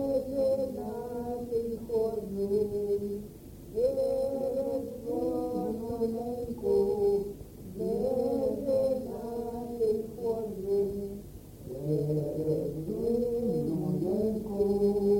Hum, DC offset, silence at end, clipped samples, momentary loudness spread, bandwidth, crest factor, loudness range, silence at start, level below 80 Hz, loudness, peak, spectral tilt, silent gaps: none; under 0.1%; 0 s; under 0.1%; 9 LU; 17 kHz; 14 dB; 2 LU; 0 s; -52 dBFS; -31 LUFS; -16 dBFS; -8.5 dB/octave; none